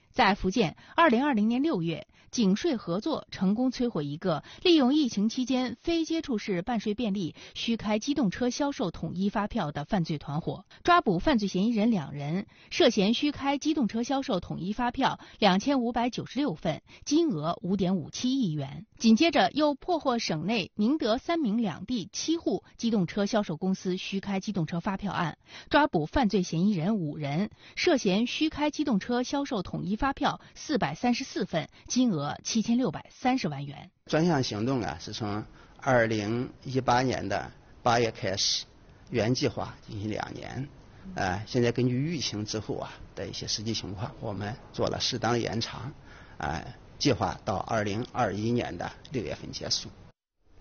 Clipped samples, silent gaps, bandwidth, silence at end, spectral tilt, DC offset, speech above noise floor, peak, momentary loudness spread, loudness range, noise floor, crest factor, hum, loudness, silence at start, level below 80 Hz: under 0.1%; none; 7 kHz; 0.55 s; -4.5 dB/octave; under 0.1%; 33 dB; -10 dBFS; 11 LU; 4 LU; -61 dBFS; 18 dB; none; -28 LUFS; 0.15 s; -52 dBFS